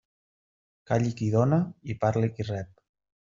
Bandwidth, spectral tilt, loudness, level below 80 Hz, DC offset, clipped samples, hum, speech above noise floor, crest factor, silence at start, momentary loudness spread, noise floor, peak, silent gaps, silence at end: 7.6 kHz; -8.5 dB/octave; -27 LUFS; -60 dBFS; under 0.1%; under 0.1%; none; over 64 dB; 20 dB; 0.9 s; 10 LU; under -90 dBFS; -10 dBFS; none; 0.6 s